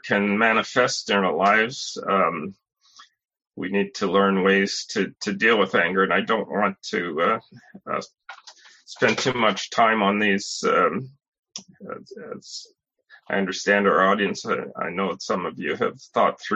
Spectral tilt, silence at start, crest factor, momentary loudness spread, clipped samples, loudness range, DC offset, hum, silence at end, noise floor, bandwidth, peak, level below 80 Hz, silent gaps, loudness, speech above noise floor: -4 dB/octave; 0.05 s; 20 dB; 19 LU; under 0.1%; 4 LU; under 0.1%; none; 0 s; -55 dBFS; 8.4 kHz; -4 dBFS; -64 dBFS; 11.28-11.32 s, 11.39-11.43 s; -22 LUFS; 33 dB